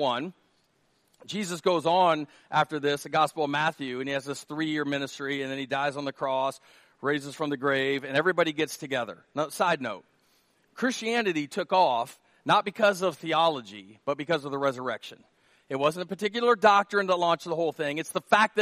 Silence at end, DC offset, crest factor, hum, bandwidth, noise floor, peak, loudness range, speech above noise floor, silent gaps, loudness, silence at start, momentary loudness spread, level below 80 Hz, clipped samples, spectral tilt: 0 s; under 0.1%; 22 dB; none; 15 kHz; -69 dBFS; -6 dBFS; 4 LU; 42 dB; none; -27 LUFS; 0 s; 11 LU; -76 dBFS; under 0.1%; -4 dB/octave